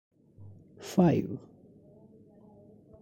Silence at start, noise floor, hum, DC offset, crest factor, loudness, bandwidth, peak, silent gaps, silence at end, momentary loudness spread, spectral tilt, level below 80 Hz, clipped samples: 0.4 s; -56 dBFS; none; under 0.1%; 20 dB; -28 LUFS; 15.5 kHz; -12 dBFS; none; 1.65 s; 28 LU; -8 dB/octave; -62 dBFS; under 0.1%